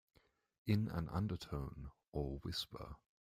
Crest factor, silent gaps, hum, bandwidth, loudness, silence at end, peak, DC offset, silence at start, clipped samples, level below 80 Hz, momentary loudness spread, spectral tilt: 20 dB; 2.08-2.12 s; none; 16 kHz; -43 LUFS; 0.35 s; -24 dBFS; under 0.1%; 0.65 s; under 0.1%; -56 dBFS; 16 LU; -6.5 dB/octave